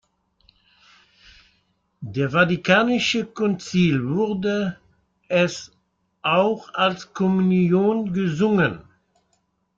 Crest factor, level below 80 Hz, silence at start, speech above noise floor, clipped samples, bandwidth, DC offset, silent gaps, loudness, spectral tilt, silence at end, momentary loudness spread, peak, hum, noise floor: 18 dB; -58 dBFS; 2 s; 49 dB; under 0.1%; 7.6 kHz; under 0.1%; none; -21 LUFS; -6 dB/octave; 0.95 s; 8 LU; -4 dBFS; none; -69 dBFS